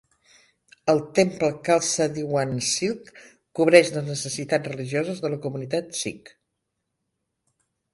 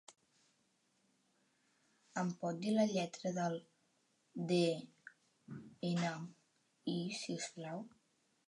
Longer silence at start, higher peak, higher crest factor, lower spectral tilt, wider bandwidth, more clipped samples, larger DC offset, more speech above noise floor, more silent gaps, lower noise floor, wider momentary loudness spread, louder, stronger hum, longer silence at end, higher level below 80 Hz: first, 0.85 s vs 0.1 s; first, 0 dBFS vs -22 dBFS; first, 24 dB vs 18 dB; second, -4 dB/octave vs -5.5 dB/octave; about the same, 11.5 kHz vs 11.5 kHz; neither; neither; first, 56 dB vs 40 dB; neither; about the same, -79 dBFS vs -78 dBFS; second, 13 LU vs 19 LU; first, -23 LUFS vs -40 LUFS; neither; first, 1.65 s vs 0.6 s; first, -64 dBFS vs -88 dBFS